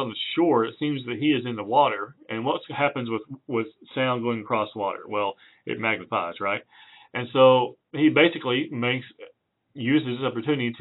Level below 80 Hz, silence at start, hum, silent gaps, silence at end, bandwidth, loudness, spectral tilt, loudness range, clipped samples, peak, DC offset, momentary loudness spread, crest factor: -76 dBFS; 0 s; none; none; 0 s; 4.1 kHz; -25 LUFS; -3.5 dB/octave; 5 LU; under 0.1%; -4 dBFS; under 0.1%; 13 LU; 20 dB